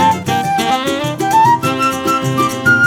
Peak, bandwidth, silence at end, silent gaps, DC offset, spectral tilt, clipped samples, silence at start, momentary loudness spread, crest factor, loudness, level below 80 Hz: 0 dBFS; 19 kHz; 0 s; none; under 0.1%; -4.5 dB/octave; under 0.1%; 0 s; 5 LU; 12 dB; -14 LUFS; -50 dBFS